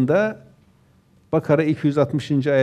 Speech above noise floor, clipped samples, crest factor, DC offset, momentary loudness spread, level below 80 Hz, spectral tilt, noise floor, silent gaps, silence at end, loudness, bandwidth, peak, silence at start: 37 dB; under 0.1%; 16 dB; under 0.1%; 6 LU; -62 dBFS; -8 dB/octave; -56 dBFS; none; 0 s; -21 LUFS; 10 kHz; -4 dBFS; 0 s